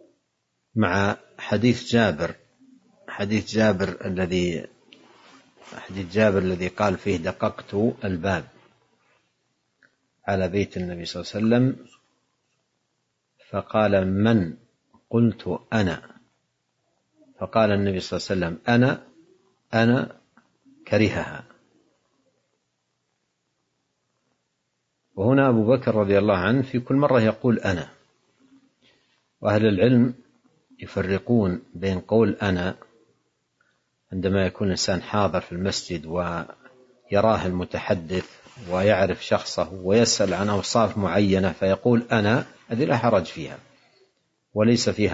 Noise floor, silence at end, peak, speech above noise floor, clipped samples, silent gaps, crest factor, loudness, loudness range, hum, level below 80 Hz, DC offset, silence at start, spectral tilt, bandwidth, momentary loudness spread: -76 dBFS; 0 s; -4 dBFS; 54 dB; under 0.1%; none; 20 dB; -23 LUFS; 6 LU; none; -58 dBFS; under 0.1%; 0.75 s; -6 dB/octave; 8 kHz; 13 LU